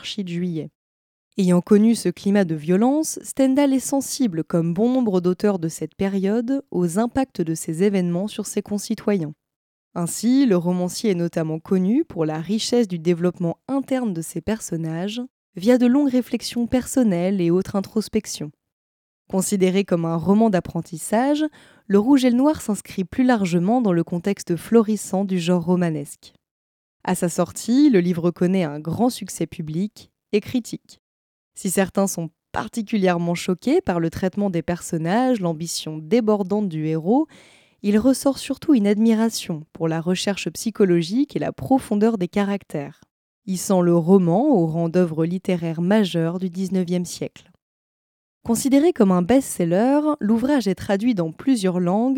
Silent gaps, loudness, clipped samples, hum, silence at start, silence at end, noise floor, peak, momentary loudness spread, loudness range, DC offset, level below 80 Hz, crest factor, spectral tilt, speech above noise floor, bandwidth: 0.75-1.31 s, 9.56-9.91 s, 15.30-15.53 s, 18.72-19.25 s, 26.51-27.00 s, 30.99-31.51 s, 43.11-43.42 s, 47.62-48.41 s; -21 LUFS; under 0.1%; none; 0 s; 0 s; under -90 dBFS; -4 dBFS; 10 LU; 4 LU; under 0.1%; -56 dBFS; 18 dB; -6 dB/octave; over 70 dB; 17 kHz